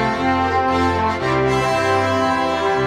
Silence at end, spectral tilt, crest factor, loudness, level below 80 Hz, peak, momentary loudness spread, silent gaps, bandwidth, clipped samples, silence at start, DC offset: 0 s; -5.5 dB/octave; 12 dB; -18 LUFS; -40 dBFS; -6 dBFS; 1 LU; none; 14.5 kHz; under 0.1%; 0 s; under 0.1%